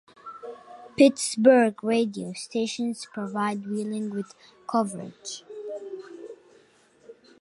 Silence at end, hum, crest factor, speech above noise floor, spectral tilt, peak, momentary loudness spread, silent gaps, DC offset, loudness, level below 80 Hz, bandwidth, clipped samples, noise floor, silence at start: 0.3 s; none; 22 dB; 34 dB; -4.5 dB/octave; -4 dBFS; 22 LU; none; under 0.1%; -25 LUFS; -74 dBFS; 11.5 kHz; under 0.1%; -59 dBFS; 0.25 s